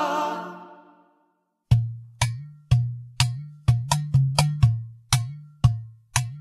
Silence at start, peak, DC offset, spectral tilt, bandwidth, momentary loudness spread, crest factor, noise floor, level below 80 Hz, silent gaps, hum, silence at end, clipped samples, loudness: 0 s; 0 dBFS; under 0.1%; -5 dB/octave; 13.5 kHz; 13 LU; 24 dB; -70 dBFS; -40 dBFS; none; none; 0 s; under 0.1%; -24 LUFS